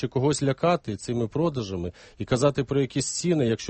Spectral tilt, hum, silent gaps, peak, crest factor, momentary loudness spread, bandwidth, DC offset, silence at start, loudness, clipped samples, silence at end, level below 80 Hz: -5.5 dB/octave; none; none; -8 dBFS; 18 dB; 9 LU; 8.8 kHz; under 0.1%; 0 s; -26 LUFS; under 0.1%; 0 s; -52 dBFS